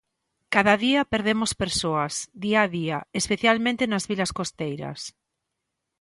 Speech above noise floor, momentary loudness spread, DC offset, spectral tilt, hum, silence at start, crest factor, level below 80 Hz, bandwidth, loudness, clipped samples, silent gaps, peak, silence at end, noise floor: 57 dB; 11 LU; under 0.1%; -4 dB/octave; none; 0.5 s; 22 dB; -52 dBFS; 11.5 kHz; -24 LUFS; under 0.1%; none; -4 dBFS; 0.9 s; -82 dBFS